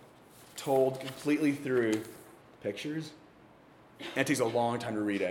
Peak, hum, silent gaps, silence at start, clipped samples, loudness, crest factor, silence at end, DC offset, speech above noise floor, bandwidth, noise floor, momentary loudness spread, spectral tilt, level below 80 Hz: -12 dBFS; none; none; 0 s; under 0.1%; -32 LUFS; 20 dB; 0 s; under 0.1%; 27 dB; 18 kHz; -58 dBFS; 17 LU; -5 dB/octave; -74 dBFS